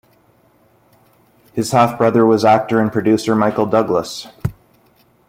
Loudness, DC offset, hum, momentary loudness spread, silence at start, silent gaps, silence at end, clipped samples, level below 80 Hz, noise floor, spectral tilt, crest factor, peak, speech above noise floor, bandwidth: -15 LUFS; under 0.1%; none; 14 LU; 1.55 s; none; 0.75 s; under 0.1%; -50 dBFS; -54 dBFS; -6 dB/octave; 16 dB; -2 dBFS; 40 dB; 16 kHz